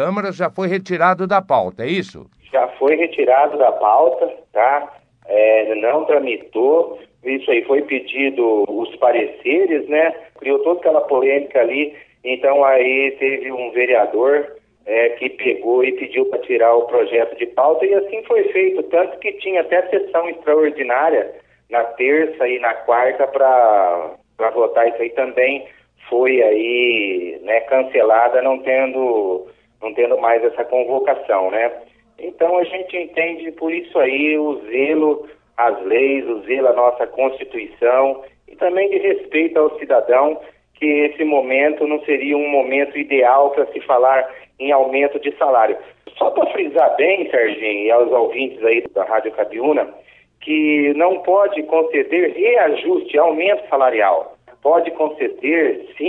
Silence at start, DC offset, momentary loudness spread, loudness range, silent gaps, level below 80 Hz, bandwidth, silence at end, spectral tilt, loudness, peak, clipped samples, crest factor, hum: 0 s; under 0.1%; 8 LU; 2 LU; none; -64 dBFS; 6.2 kHz; 0 s; -7 dB/octave; -17 LUFS; 0 dBFS; under 0.1%; 16 dB; none